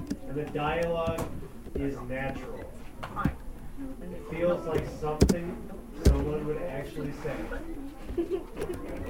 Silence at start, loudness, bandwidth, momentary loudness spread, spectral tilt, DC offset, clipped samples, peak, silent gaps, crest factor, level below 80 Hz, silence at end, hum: 0 s; -32 LUFS; 16.5 kHz; 15 LU; -6.5 dB/octave; under 0.1%; under 0.1%; -8 dBFS; none; 24 dB; -36 dBFS; 0 s; none